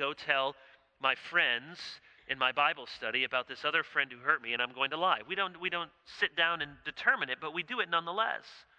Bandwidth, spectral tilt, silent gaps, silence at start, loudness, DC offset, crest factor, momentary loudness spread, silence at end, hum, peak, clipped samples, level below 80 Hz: 9.8 kHz; -3.5 dB/octave; none; 0 s; -31 LUFS; under 0.1%; 22 dB; 9 LU; 0.2 s; none; -12 dBFS; under 0.1%; -74 dBFS